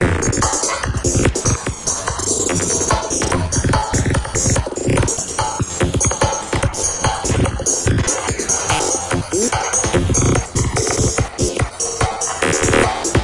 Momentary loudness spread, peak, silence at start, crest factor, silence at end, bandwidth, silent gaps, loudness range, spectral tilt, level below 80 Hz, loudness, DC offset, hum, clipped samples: 4 LU; -2 dBFS; 0 s; 16 dB; 0 s; 11.5 kHz; none; 1 LU; -3.5 dB/octave; -28 dBFS; -17 LUFS; under 0.1%; none; under 0.1%